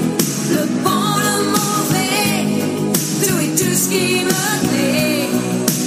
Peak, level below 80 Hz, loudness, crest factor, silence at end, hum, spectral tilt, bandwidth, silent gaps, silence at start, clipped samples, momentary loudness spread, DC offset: 0 dBFS; -54 dBFS; -16 LUFS; 16 dB; 0 s; none; -3.5 dB/octave; 15.5 kHz; none; 0 s; under 0.1%; 3 LU; under 0.1%